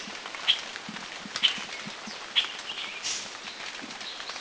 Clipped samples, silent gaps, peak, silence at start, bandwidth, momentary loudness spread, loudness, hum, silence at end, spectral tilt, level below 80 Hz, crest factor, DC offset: under 0.1%; none; -8 dBFS; 0 s; 8 kHz; 12 LU; -30 LUFS; none; 0 s; 0 dB/octave; -70 dBFS; 26 dB; under 0.1%